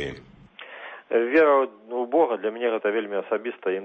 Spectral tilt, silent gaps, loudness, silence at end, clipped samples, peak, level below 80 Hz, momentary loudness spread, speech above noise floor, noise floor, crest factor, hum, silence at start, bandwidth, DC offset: -6.5 dB/octave; none; -23 LUFS; 0 s; under 0.1%; -8 dBFS; -62 dBFS; 21 LU; 21 dB; -44 dBFS; 16 dB; none; 0 s; 6.2 kHz; under 0.1%